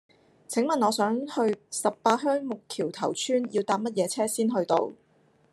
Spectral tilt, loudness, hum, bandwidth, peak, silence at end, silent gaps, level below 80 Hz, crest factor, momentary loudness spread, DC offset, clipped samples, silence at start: -4 dB/octave; -27 LUFS; none; 13 kHz; -8 dBFS; 0.6 s; none; -78 dBFS; 20 dB; 6 LU; under 0.1%; under 0.1%; 0.5 s